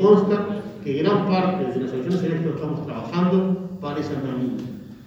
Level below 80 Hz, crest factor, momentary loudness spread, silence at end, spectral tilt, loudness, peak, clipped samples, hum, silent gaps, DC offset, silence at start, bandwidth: -58 dBFS; 18 dB; 9 LU; 0 s; -8.5 dB/octave; -23 LUFS; -4 dBFS; under 0.1%; none; none; under 0.1%; 0 s; 7.4 kHz